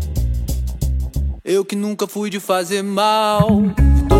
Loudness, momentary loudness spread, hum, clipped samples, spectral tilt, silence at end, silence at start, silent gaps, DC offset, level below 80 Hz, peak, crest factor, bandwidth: -18 LUFS; 8 LU; none; under 0.1%; -6 dB/octave; 0 s; 0 s; none; under 0.1%; -20 dBFS; 0 dBFS; 16 dB; 16 kHz